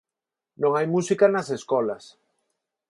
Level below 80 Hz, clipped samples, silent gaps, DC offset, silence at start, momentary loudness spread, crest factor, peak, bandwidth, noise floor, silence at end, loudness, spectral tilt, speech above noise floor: -74 dBFS; under 0.1%; none; under 0.1%; 0.6 s; 8 LU; 20 dB; -6 dBFS; 11.5 kHz; -88 dBFS; 0.9 s; -23 LUFS; -6 dB/octave; 66 dB